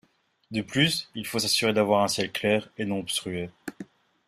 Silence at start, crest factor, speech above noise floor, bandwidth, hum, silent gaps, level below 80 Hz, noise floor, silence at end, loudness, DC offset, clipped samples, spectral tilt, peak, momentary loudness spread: 0.5 s; 20 dB; 20 dB; 15.5 kHz; none; none; -64 dBFS; -46 dBFS; 0.45 s; -26 LUFS; under 0.1%; under 0.1%; -3.5 dB/octave; -8 dBFS; 16 LU